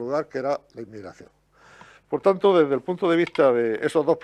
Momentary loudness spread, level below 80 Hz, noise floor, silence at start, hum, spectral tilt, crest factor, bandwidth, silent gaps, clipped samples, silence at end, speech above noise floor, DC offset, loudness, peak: 20 LU; -68 dBFS; -51 dBFS; 0 s; none; -6.5 dB/octave; 18 dB; 11 kHz; none; under 0.1%; 0.05 s; 29 dB; under 0.1%; -22 LUFS; -6 dBFS